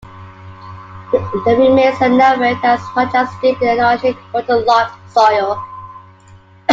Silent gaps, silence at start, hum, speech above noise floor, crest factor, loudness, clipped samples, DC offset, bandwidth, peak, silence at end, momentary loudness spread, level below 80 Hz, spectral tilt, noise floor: none; 0.05 s; none; 30 dB; 14 dB; -14 LUFS; under 0.1%; under 0.1%; 7.6 kHz; 0 dBFS; 0 s; 17 LU; -50 dBFS; -6 dB/octave; -43 dBFS